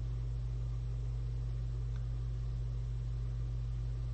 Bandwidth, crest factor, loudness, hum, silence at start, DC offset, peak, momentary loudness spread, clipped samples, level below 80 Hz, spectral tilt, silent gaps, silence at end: 7.8 kHz; 8 dB; -40 LUFS; none; 0 s; under 0.1%; -30 dBFS; 0 LU; under 0.1%; -40 dBFS; -8 dB/octave; none; 0 s